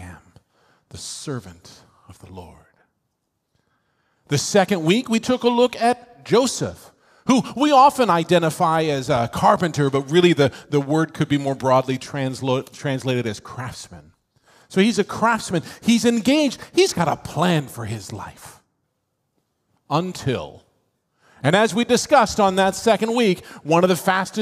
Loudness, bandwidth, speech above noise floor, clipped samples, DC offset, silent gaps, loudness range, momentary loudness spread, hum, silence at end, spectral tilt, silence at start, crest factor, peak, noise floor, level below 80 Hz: -19 LUFS; 16 kHz; 55 dB; under 0.1%; under 0.1%; none; 12 LU; 14 LU; none; 0 s; -5 dB/octave; 0 s; 20 dB; -2 dBFS; -74 dBFS; -56 dBFS